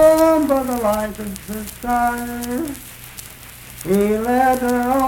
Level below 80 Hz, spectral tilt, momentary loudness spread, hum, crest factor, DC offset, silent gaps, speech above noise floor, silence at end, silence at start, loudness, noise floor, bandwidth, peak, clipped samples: -40 dBFS; -5 dB/octave; 19 LU; none; 16 dB; under 0.1%; none; 19 dB; 0 s; 0 s; -19 LUFS; -38 dBFS; 19 kHz; -2 dBFS; under 0.1%